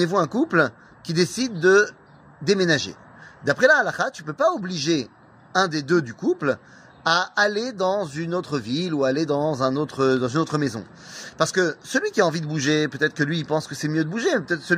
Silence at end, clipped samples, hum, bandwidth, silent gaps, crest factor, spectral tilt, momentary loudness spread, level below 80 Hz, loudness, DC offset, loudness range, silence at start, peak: 0 s; under 0.1%; none; 15.5 kHz; none; 18 dB; -4.5 dB/octave; 8 LU; -64 dBFS; -22 LUFS; under 0.1%; 3 LU; 0 s; -4 dBFS